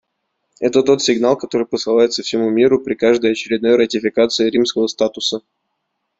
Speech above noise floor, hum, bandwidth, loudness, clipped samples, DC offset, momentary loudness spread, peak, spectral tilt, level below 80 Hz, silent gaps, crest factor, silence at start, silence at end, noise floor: 57 dB; none; 8 kHz; -16 LUFS; under 0.1%; under 0.1%; 5 LU; -2 dBFS; -4 dB/octave; -58 dBFS; none; 14 dB; 0.6 s; 0.8 s; -73 dBFS